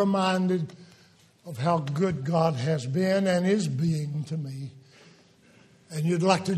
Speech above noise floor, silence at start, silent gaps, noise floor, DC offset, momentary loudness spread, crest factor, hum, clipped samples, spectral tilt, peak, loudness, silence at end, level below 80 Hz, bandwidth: 33 dB; 0 s; none; -58 dBFS; under 0.1%; 14 LU; 20 dB; none; under 0.1%; -6.5 dB/octave; -8 dBFS; -26 LUFS; 0 s; -64 dBFS; 13 kHz